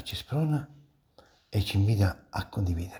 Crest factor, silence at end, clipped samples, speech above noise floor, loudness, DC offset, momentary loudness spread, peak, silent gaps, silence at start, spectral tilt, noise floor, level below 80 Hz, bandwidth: 16 dB; 0 s; under 0.1%; 33 dB; -29 LUFS; under 0.1%; 9 LU; -12 dBFS; none; 0 s; -6.5 dB/octave; -61 dBFS; -46 dBFS; 19.5 kHz